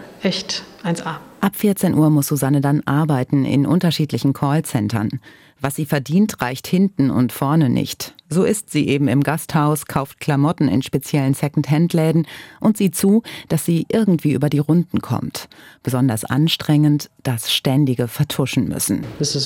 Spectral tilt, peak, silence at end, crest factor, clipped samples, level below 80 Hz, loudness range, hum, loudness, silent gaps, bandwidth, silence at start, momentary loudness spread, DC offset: -6 dB/octave; -4 dBFS; 0 s; 14 dB; under 0.1%; -54 dBFS; 2 LU; none; -19 LUFS; none; 17 kHz; 0 s; 8 LU; under 0.1%